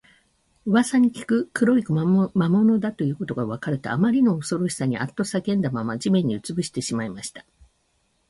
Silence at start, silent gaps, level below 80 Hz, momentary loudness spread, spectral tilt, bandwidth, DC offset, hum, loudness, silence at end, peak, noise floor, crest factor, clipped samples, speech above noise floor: 0.65 s; none; -60 dBFS; 9 LU; -6.5 dB/octave; 11.5 kHz; under 0.1%; none; -23 LUFS; 0.9 s; -8 dBFS; -68 dBFS; 14 dB; under 0.1%; 46 dB